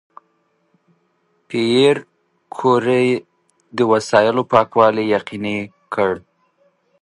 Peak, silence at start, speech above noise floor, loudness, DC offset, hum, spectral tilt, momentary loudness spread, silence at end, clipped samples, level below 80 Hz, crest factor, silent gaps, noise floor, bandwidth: 0 dBFS; 1.5 s; 48 dB; -17 LUFS; under 0.1%; none; -5.5 dB/octave; 12 LU; 0.8 s; under 0.1%; -60 dBFS; 18 dB; none; -64 dBFS; 11.5 kHz